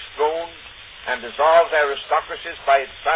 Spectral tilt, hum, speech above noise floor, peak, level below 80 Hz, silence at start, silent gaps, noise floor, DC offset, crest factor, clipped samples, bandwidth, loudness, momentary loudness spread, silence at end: -5.5 dB/octave; none; 22 dB; -4 dBFS; -54 dBFS; 0 s; none; -41 dBFS; under 0.1%; 16 dB; under 0.1%; 4 kHz; -20 LUFS; 18 LU; 0 s